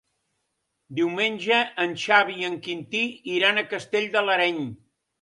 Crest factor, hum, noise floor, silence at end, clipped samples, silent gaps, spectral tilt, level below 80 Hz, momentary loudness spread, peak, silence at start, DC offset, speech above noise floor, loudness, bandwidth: 22 dB; none; -77 dBFS; 0.45 s; under 0.1%; none; -4 dB/octave; -72 dBFS; 10 LU; -4 dBFS; 0.9 s; under 0.1%; 53 dB; -23 LUFS; 11.5 kHz